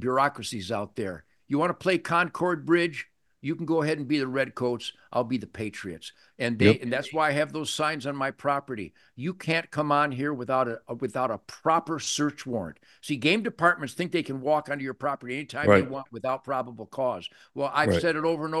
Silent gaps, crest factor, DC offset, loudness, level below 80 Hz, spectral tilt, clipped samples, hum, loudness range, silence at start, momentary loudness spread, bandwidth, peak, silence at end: none; 24 dB; under 0.1%; -27 LUFS; -64 dBFS; -5 dB/octave; under 0.1%; none; 2 LU; 0 s; 12 LU; 12.5 kHz; -4 dBFS; 0 s